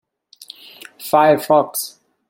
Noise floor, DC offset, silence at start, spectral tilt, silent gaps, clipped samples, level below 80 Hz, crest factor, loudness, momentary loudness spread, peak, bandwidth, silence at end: -43 dBFS; under 0.1%; 1 s; -4 dB/octave; none; under 0.1%; -64 dBFS; 18 dB; -16 LUFS; 24 LU; -2 dBFS; 17 kHz; 0.4 s